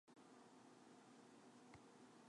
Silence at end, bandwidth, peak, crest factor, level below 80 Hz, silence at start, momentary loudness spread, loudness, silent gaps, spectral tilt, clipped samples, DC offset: 0 s; 11 kHz; -48 dBFS; 18 dB; under -90 dBFS; 0.05 s; 1 LU; -66 LUFS; none; -4.5 dB/octave; under 0.1%; under 0.1%